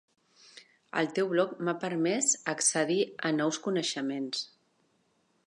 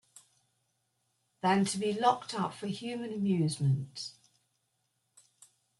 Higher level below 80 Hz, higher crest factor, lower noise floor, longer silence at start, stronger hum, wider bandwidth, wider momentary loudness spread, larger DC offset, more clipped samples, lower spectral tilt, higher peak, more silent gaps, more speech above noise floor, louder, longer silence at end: second, -86 dBFS vs -74 dBFS; about the same, 20 dB vs 22 dB; second, -72 dBFS vs -79 dBFS; second, 0.55 s vs 1.45 s; neither; about the same, 11.5 kHz vs 12 kHz; about the same, 8 LU vs 10 LU; neither; neither; second, -3 dB/octave vs -5.5 dB/octave; about the same, -12 dBFS vs -12 dBFS; neither; second, 42 dB vs 48 dB; first, -29 LUFS vs -32 LUFS; second, 1 s vs 1.7 s